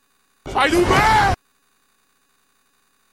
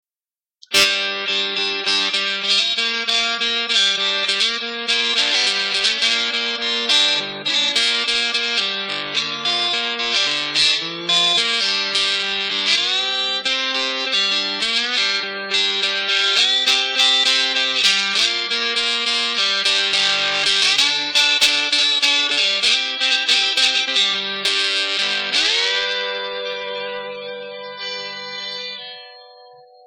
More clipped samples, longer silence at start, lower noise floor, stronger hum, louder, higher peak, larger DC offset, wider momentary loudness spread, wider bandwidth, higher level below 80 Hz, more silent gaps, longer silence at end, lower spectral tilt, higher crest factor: neither; second, 0.45 s vs 0.7 s; second, -64 dBFS vs under -90 dBFS; neither; about the same, -17 LUFS vs -16 LUFS; about the same, -2 dBFS vs -2 dBFS; neither; first, 14 LU vs 10 LU; about the same, 16 kHz vs 17 kHz; first, -36 dBFS vs -62 dBFS; neither; first, 1.75 s vs 0.4 s; first, -4.5 dB/octave vs 0.5 dB/octave; about the same, 18 dB vs 16 dB